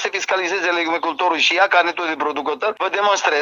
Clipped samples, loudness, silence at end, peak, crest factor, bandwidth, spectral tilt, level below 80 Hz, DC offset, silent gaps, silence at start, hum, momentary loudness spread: under 0.1%; -18 LUFS; 0 s; -2 dBFS; 16 dB; 7.6 kHz; -0.5 dB/octave; -76 dBFS; under 0.1%; none; 0 s; none; 7 LU